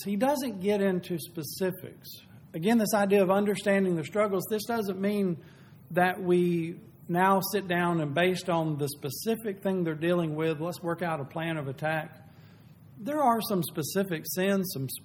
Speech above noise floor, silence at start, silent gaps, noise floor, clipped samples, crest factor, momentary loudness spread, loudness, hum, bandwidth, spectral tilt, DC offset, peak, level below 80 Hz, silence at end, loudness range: 25 dB; 0 s; none; -53 dBFS; under 0.1%; 18 dB; 10 LU; -28 LUFS; none; 19 kHz; -5.5 dB/octave; under 0.1%; -10 dBFS; -70 dBFS; 0 s; 4 LU